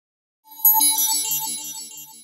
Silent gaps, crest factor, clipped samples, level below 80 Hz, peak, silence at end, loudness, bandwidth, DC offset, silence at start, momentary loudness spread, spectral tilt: none; 18 dB; under 0.1%; -76 dBFS; -4 dBFS; 0 s; -17 LUFS; 16.5 kHz; under 0.1%; 0.5 s; 18 LU; 2 dB/octave